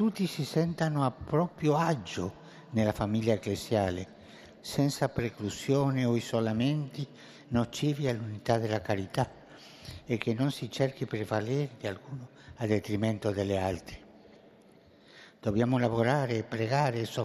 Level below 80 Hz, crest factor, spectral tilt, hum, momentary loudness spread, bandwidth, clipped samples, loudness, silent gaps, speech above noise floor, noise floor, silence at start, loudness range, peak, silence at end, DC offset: -60 dBFS; 20 dB; -6.5 dB/octave; none; 15 LU; 14 kHz; under 0.1%; -31 LUFS; none; 28 dB; -58 dBFS; 0 s; 3 LU; -10 dBFS; 0 s; under 0.1%